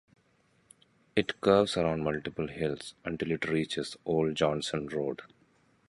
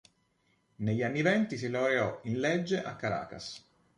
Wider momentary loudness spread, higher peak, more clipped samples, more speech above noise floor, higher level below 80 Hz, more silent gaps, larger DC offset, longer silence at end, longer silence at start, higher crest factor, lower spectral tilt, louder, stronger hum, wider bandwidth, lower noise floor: second, 11 LU vs 14 LU; first, -10 dBFS vs -14 dBFS; neither; second, 38 dB vs 42 dB; first, -58 dBFS vs -66 dBFS; neither; neither; first, 0.6 s vs 0.4 s; first, 1.15 s vs 0.8 s; about the same, 22 dB vs 20 dB; about the same, -5.5 dB/octave vs -6 dB/octave; about the same, -31 LUFS vs -31 LUFS; neither; about the same, 11.5 kHz vs 11 kHz; second, -69 dBFS vs -73 dBFS